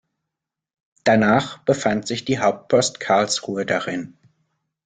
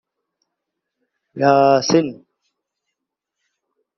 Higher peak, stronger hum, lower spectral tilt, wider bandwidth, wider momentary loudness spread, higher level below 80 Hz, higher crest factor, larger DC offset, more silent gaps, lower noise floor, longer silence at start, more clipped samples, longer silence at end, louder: about the same, -4 dBFS vs -2 dBFS; neither; about the same, -4.5 dB/octave vs -4.5 dB/octave; first, 9.6 kHz vs 6.6 kHz; about the same, 7 LU vs 7 LU; first, -58 dBFS vs -64 dBFS; about the same, 18 dB vs 20 dB; neither; neither; about the same, -84 dBFS vs -81 dBFS; second, 1.05 s vs 1.35 s; neither; second, 0.8 s vs 1.85 s; second, -20 LUFS vs -15 LUFS